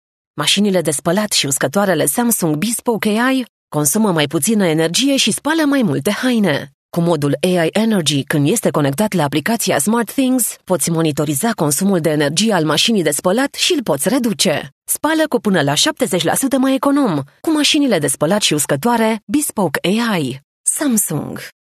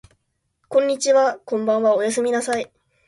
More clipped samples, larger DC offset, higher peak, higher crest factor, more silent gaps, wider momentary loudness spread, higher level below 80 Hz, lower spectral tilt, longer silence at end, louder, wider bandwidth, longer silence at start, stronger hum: neither; neither; first, 0 dBFS vs -6 dBFS; about the same, 16 dB vs 16 dB; first, 3.49-3.68 s, 6.74-6.89 s, 14.72-14.81 s, 19.23-19.27 s, 20.44-20.64 s vs none; second, 4 LU vs 8 LU; first, -58 dBFS vs -66 dBFS; about the same, -4 dB/octave vs -3 dB/octave; second, 0.2 s vs 0.4 s; first, -15 LUFS vs -20 LUFS; first, 14 kHz vs 11.5 kHz; second, 0.35 s vs 0.7 s; neither